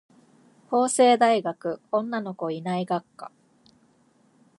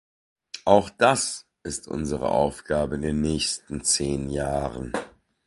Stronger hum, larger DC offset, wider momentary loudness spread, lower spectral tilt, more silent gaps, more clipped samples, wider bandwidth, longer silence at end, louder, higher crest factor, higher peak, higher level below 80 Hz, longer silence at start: neither; neither; first, 17 LU vs 12 LU; about the same, -4.5 dB/octave vs -4 dB/octave; neither; neither; about the same, 11.5 kHz vs 12 kHz; first, 1.3 s vs 0.4 s; about the same, -24 LUFS vs -25 LUFS; about the same, 20 dB vs 24 dB; second, -6 dBFS vs -2 dBFS; second, -78 dBFS vs -44 dBFS; first, 0.7 s vs 0.55 s